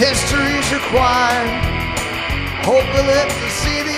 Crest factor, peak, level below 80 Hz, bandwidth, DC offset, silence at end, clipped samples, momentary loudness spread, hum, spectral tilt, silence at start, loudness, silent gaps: 16 dB; -2 dBFS; -28 dBFS; 15.5 kHz; under 0.1%; 0 s; under 0.1%; 6 LU; none; -3.5 dB/octave; 0 s; -16 LUFS; none